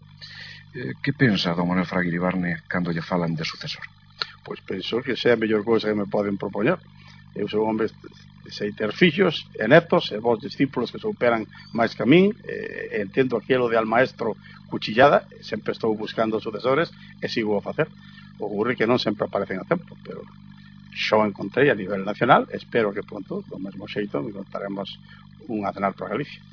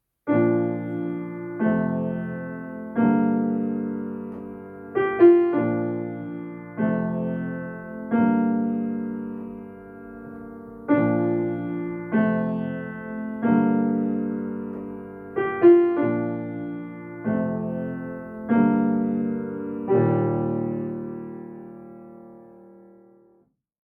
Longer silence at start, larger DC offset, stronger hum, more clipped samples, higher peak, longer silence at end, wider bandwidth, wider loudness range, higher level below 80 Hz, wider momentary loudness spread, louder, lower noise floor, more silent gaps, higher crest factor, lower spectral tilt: about the same, 0.15 s vs 0.25 s; neither; first, 50 Hz at -45 dBFS vs none; neither; about the same, -2 dBFS vs -4 dBFS; second, 0.15 s vs 1.15 s; first, 5.4 kHz vs 3.5 kHz; about the same, 5 LU vs 5 LU; about the same, -62 dBFS vs -62 dBFS; about the same, 15 LU vs 17 LU; about the same, -23 LUFS vs -24 LUFS; second, -45 dBFS vs -63 dBFS; neither; about the same, 22 dB vs 20 dB; second, -7 dB/octave vs -11.5 dB/octave